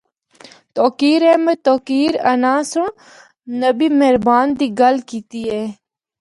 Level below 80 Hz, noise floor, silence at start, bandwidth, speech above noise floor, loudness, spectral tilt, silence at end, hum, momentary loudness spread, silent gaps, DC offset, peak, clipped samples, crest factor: -56 dBFS; -45 dBFS; 0.75 s; 11.5 kHz; 30 dB; -16 LUFS; -4.5 dB/octave; 0.45 s; none; 12 LU; none; under 0.1%; -2 dBFS; under 0.1%; 14 dB